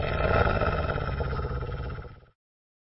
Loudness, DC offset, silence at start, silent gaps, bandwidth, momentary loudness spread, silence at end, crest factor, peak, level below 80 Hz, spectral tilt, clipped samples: -28 LUFS; under 0.1%; 0 s; none; 5.8 kHz; 14 LU; 0.75 s; 18 dB; -10 dBFS; -34 dBFS; -10.5 dB/octave; under 0.1%